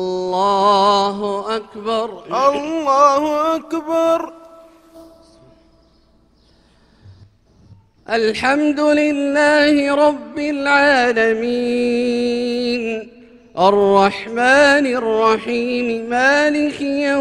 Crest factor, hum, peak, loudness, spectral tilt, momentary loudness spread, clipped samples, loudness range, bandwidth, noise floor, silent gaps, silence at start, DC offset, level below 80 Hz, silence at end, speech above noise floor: 16 dB; none; 0 dBFS; -16 LUFS; -4 dB/octave; 10 LU; under 0.1%; 8 LU; 12.5 kHz; -54 dBFS; none; 0 s; under 0.1%; -54 dBFS; 0 s; 39 dB